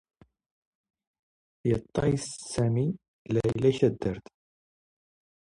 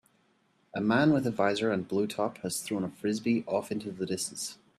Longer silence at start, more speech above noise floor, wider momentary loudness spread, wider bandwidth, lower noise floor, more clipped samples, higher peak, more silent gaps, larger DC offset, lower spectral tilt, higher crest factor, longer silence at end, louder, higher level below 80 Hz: first, 1.65 s vs 0.75 s; first, over 63 dB vs 40 dB; about the same, 9 LU vs 9 LU; second, 11.5 kHz vs 14 kHz; first, under -90 dBFS vs -69 dBFS; neither; about the same, -10 dBFS vs -12 dBFS; first, 3.08-3.25 s vs none; neither; first, -7 dB/octave vs -5 dB/octave; about the same, 20 dB vs 18 dB; first, 1.4 s vs 0.25 s; about the same, -28 LUFS vs -30 LUFS; first, -54 dBFS vs -68 dBFS